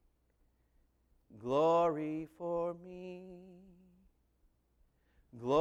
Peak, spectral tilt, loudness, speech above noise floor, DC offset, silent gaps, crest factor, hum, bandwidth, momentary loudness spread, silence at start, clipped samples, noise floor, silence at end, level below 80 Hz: -18 dBFS; -7 dB/octave; -34 LUFS; 40 dB; under 0.1%; none; 20 dB; none; 8.2 kHz; 20 LU; 1.35 s; under 0.1%; -74 dBFS; 0 s; -70 dBFS